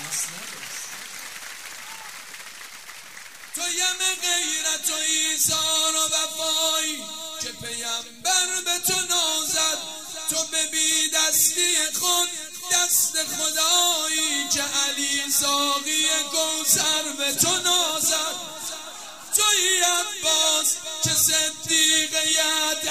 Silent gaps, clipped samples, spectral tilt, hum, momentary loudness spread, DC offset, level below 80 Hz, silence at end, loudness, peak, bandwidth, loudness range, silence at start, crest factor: none; under 0.1%; 0.5 dB/octave; none; 17 LU; 0.3%; -66 dBFS; 0 s; -20 LUFS; -4 dBFS; 16 kHz; 6 LU; 0 s; 20 dB